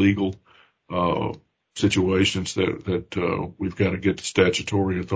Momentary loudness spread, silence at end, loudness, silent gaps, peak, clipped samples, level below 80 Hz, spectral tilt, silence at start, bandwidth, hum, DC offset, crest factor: 10 LU; 0 s; -24 LUFS; none; -2 dBFS; under 0.1%; -44 dBFS; -5.5 dB/octave; 0 s; 8 kHz; none; under 0.1%; 20 dB